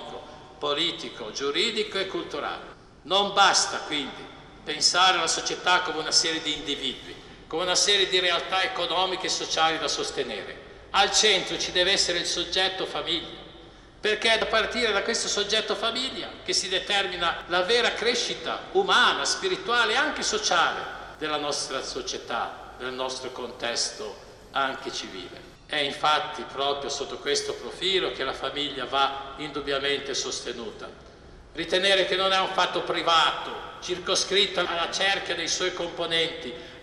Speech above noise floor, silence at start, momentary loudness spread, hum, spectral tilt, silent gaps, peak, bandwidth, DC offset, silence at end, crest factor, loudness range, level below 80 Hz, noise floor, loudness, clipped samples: 22 dB; 0 s; 15 LU; none; -1 dB/octave; none; -6 dBFS; 12.5 kHz; under 0.1%; 0 s; 20 dB; 6 LU; -56 dBFS; -48 dBFS; -25 LUFS; under 0.1%